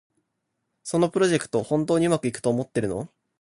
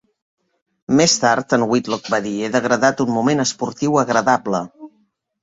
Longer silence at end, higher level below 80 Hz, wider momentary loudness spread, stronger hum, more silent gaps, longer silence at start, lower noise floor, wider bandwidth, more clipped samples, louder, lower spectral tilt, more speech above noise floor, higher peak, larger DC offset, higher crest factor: second, 0.35 s vs 0.55 s; about the same, -58 dBFS vs -58 dBFS; about the same, 10 LU vs 8 LU; neither; neither; about the same, 0.85 s vs 0.9 s; first, -78 dBFS vs -63 dBFS; first, 11.5 kHz vs 8 kHz; neither; second, -24 LUFS vs -18 LUFS; first, -5.5 dB/octave vs -4 dB/octave; first, 55 dB vs 46 dB; second, -8 dBFS vs -2 dBFS; neither; about the same, 16 dB vs 18 dB